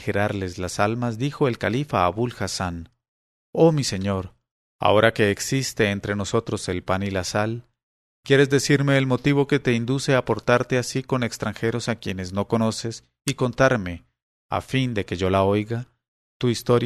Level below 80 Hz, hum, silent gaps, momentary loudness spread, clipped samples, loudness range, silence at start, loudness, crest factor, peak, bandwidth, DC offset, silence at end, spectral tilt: -52 dBFS; none; 3.08-3.53 s, 4.51-4.79 s, 7.83-8.23 s, 14.22-14.49 s, 16.08-16.40 s; 11 LU; under 0.1%; 4 LU; 0 s; -23 LUFS; 22 dB; -2 dBFS; 13.5 kHz; under 0.1%; 0 s; -5.5 dB/octave